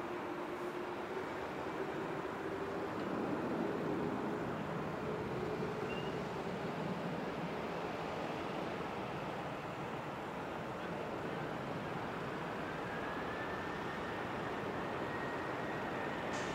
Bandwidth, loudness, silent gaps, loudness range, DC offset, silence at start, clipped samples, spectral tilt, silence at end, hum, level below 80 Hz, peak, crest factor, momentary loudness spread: 16 kHz; -41 LUFS; none; 3 LU; under 0.1%; 0 s; under 0.1%; -6 dB/octave; 0 s; none; -64 dBFS; -26 dBFS; 14 dB; 4 LU